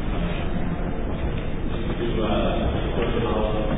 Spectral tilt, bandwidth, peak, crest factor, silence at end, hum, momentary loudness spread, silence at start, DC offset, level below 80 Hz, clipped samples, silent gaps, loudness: -11 dB/octave; 4 kHz; -10 dBFS; 12 dB; 0 s; none; 5 LU; 0 s; under 0.1%; -28 dBFS; under 0.1%; none; -26 LUFS